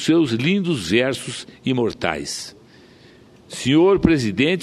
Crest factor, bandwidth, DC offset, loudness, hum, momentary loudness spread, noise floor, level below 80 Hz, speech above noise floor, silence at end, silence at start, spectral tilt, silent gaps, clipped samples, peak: 20 dB; 13 kHz; under 0.1%; -19 LUFS; none; 14 LU; -48 dBFS; -46 dBFS; 29 dB; 0 s; 0 s; -5.5 dB/octave; none; under 0.1%; 0 dBFS